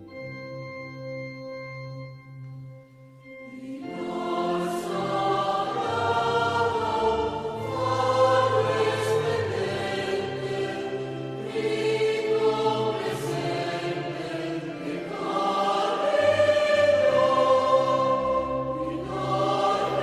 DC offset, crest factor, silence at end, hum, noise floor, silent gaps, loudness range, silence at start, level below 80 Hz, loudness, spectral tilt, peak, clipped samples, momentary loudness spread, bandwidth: under 0.1%; 18 dB; 0 s; none; -49 dBFS; none; 11 LU; 0 s; -56 dBFS; -25 LUFS; -5.5 dB/octave; -8 dBFS; under 0.1%; 17 LU; 14 kHz